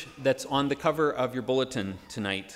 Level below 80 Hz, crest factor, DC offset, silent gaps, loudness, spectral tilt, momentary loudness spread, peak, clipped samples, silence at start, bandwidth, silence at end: -60 dBFS; 18 dB; under 0.1%; none; -28 LUFS; -5 dB/octave; 8 LU; -10 dBFS; under 0.1%; 0 s; 16 kHz; 0 s